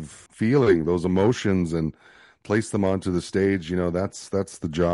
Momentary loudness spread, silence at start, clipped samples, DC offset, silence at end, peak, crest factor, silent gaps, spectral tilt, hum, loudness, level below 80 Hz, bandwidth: 9 LU; 0 s; under 0.1%; under 0.1%; 0 s; -8 dBFS; 16 dB; none; -6.5 dB/octave; none; -24 LUFS; -48 dBFS; 11.5 kHz